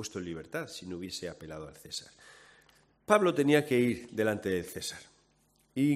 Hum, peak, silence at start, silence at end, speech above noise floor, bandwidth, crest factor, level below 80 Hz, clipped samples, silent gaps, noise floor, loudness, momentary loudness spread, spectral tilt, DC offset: none; -10 dBFS; 0 s; 0 s; 38 dB; 16 kHz; 22 dB; -68 dBFS; under 0.1%; none; -69 dBFS; -31 LUFS; 18 LU; -5 dB/octave; under 0.1%